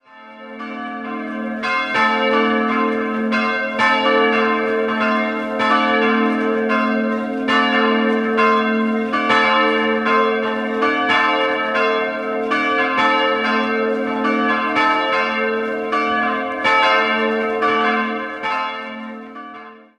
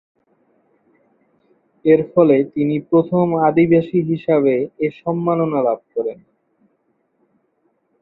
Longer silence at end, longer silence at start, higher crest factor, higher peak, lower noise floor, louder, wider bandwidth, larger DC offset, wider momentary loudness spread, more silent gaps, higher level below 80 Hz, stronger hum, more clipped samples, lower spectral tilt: second, 0.2 s vs 1.9 s; second, 0.15 s vs 1.85 s; about the same, 16 dB vs 18 dB; about the same, -2 dBFS vs -2 dBFS; second, -39 dBFS vs -65 dBFS; about the same, -17 LUFS vs -17 LUFS; first, 10 kHz vs 4.1 kHz; neither; about the same, 10 LU vs 9 LU; neither; about the same, -60 dBFS vs -60 dBFS; neither; neither; second, -5 dB/octave vs -11.5 dB/octave